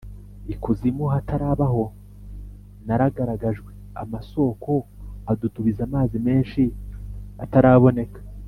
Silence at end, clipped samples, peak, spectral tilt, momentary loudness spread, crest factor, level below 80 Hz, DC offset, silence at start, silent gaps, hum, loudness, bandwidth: 0 s; under 0.1%; -2 dBFS; -10.5 dB/octave; 21 LU; 20 dB; -38 dBFS; under 0.1%; 0.05 s; none; 50 Hz at -40 dBFS; -22 LUFS; 4.7 kHz